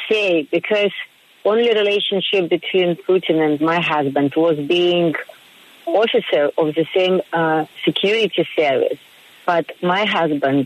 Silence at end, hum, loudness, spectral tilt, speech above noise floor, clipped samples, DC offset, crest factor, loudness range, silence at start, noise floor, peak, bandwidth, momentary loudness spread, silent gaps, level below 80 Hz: 0 s; none; -18 LUFS; -6 dB/octave; 21 dB; under 0.1%; under 0.1%; 14 dB; 1 LU; 0 s; -38 dBFS; -4 dBFS; 13.5 kHz; 5 LU; none; -68 dBFS